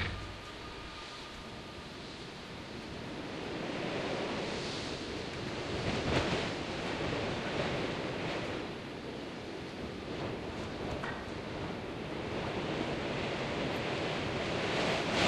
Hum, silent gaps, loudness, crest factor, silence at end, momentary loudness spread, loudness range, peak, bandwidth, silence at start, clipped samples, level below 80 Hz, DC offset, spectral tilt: none; none; -37 LUFS; 22 dB; 0 s; 12 LU; 6 LU; -16 dBFS; 12.5 kHz; 0 s; under 0.1%; -54 dBFS; under 0.1%; -5 dB/octave